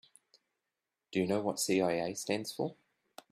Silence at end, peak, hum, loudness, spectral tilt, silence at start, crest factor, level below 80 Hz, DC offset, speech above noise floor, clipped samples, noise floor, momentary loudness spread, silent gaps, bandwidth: 0.6 s; -18 dBFS; none; -34 LUFS; -4 dB/octave; 1.1 s; 18 dB; -74 dBFS; under 0.1%; 56 dB; under 0.1%; -89 dBFS; 8 LU; none; 15.5 kHz